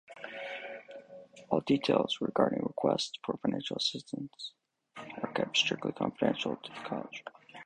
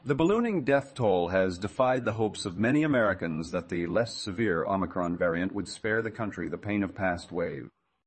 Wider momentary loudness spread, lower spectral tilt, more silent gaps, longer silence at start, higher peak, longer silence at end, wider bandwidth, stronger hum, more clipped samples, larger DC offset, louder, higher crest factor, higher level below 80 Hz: first, 19 LU vs 8 LU; second, -4.5 dB/octave vs -6 dB/octave; neither; about the same, 0.1 s vs 0.05 s; about the same, -10 dBFS vs -12 dBFS; second, 0 s vs 0.4 s; first, 10.5 kHz vs 8.8 kHz; neither; neither; neither; second, -33 LUFS vs -29 LUFS; first, 24 dB vs 16 dB; second, -70 dBFS vs -60 dBFS